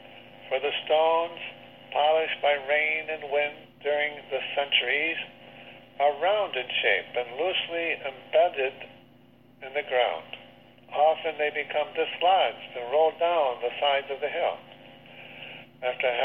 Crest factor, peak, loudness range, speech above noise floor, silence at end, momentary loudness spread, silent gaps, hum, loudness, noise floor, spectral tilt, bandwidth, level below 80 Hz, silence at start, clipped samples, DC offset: 18 dB; -10 dBFS; 3 LU; 30 dB; 0 s; 18 LU; none; 60 Hz at -60 dBFS; -26 LUFS; -56 dBFS; -5 dB/octave; 4.3 kHz; -72 dBFS; 0.05 s; under 0.1%; under 0.1%